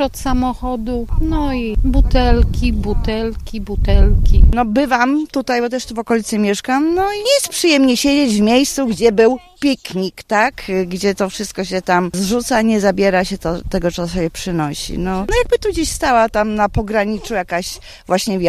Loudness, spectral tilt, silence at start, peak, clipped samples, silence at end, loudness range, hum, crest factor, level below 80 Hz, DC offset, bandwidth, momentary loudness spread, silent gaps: -16 LUFS; -5 dB/octave; 0 s; 0 dBFS; under 0.1%; 0 s; 4 LU; none; 16 dB; -20 dBFS; under 0.1%; 15 kHz; 8 LU; none